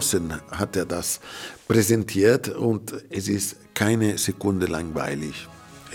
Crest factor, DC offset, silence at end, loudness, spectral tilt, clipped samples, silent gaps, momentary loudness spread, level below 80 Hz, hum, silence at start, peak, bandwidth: 20 dB; under 0.1%; 0 s; -24 LUFS; -4.5 dB/octave; under 0.1%; none; 13 LU; -54 dBFS; none; 0 s; -4 dBFS; 18 kHz